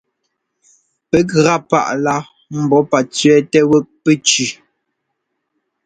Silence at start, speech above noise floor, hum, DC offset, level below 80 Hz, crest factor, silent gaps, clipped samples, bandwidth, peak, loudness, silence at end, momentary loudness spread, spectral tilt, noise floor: 1.15 s; 60 dB; none; under 0.1%; -54 dBFS; 16 dB; none; under 0.1%; 9.6 kHz; 0 dBFS; -14 LUFS; 1.3 s; 8 LU; -4.5 dB/octave; -73 dBFS